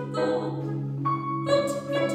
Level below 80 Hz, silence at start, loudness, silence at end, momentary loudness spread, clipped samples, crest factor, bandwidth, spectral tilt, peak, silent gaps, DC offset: -66 dBFS; 0 s; -27 LUFS; 0 s; 6 LU; under 0.1%; 16 dB; 14.5 kHz; -6.5 dB/octave; -10 dBFS; none; under 0.1%